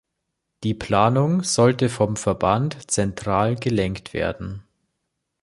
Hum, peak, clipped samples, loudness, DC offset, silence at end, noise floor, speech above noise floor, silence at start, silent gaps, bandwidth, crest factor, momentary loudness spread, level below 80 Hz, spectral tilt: none; -2 dBFS; under 0.1%; -21 LUFS; under 0.1%; 0.85 s; -79 dBFS; 58 dB; 0.6 s; none; 11.5 kHz; 20 dB; 10 LU; -46 dBFS; -5.5 dB/octave